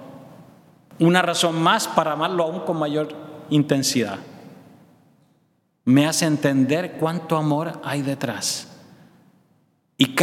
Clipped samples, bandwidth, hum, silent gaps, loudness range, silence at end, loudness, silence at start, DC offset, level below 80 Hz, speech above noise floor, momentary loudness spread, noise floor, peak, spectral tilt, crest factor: under 0.1%; 17 kHz; none; none; 5 LU; 0 s; -21 LUFS; 0 s; under 0.1%; -72 dBFS; 45 dB; 11 LU; -65 dBFS; 0 dBFS; -4.5 dB/octave; 22 dB